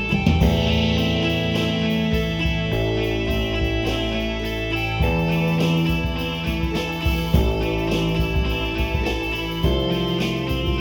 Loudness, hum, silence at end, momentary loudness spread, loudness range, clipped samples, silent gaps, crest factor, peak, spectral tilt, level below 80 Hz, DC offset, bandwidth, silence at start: -22 LUFS; none; 0 s; 5 LU; 2 LU; under 0.1%; none; 16 dB; -4 dBFS; -6.5 dB/octave; -28 dBFS; under 0.1%; 18 kHz; 0 s